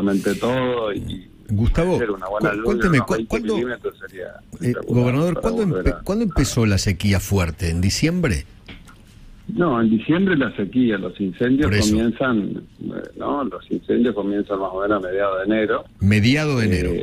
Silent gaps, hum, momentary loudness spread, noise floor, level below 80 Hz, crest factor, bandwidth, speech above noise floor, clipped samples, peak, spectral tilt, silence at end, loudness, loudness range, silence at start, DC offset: none; none; 11 LU; -44 dBFS; -34 dBFS; 16 dB; 16 kHz; 24 dB; under 0.1%; -4 dBFS; -6 dB/octave; 0 s; -20 LUFS; 2 LU; 0 s; under 0.1%